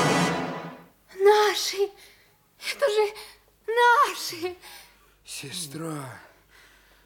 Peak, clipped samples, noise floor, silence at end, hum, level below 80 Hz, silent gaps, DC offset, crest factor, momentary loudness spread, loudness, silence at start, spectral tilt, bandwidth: -8 dBFS; under 0.1%; -59 dBFS; 0.85 s; none; -66 dBFS; none; under 0.1%; 20 dB; 23 LU; -24 LUFS; 0 s; -3.5 dB/octave; 18 kHz